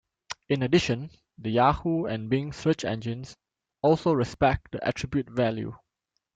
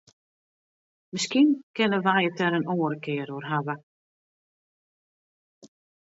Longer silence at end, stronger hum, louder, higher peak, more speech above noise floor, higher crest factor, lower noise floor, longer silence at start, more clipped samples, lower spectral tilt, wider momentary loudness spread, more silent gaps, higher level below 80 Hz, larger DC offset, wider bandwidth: first, 0.6 s vs 0.35 s; neither; about the same, -27 LUFS vs -25 LUFS; about the same, -8 dBFS vs -8 dBFS; second, 55 dB vs over 65 dB; about the same, 20 dB vs 20 dB; second, -81 dBFS vs under -90 dBFS; second, 0.3 s vs 1.15 s; neither; first, -6.5 dB/octave vs -5 dB/octave; first, 15 LU vs 10 LU; second, none vs 1.63-1.74 s, 3.83-5.61 s; first, -50 dBFS vs -78 dBFS; neither; first, 9 kHz vs 8 kHz